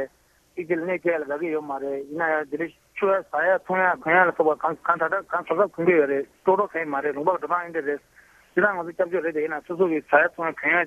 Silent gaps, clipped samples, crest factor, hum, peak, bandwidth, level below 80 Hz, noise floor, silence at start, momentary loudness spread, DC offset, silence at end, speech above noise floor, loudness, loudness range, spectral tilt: none; under 0.1%; 20 dB; none; -4 dBFS; 13 kHz; -68 dBFS; -61 dBFS; 0 s; 10 LU; under 0.1%; 0 s; 38 dB; -24 LUFS; 4 LU; -7 dB/octave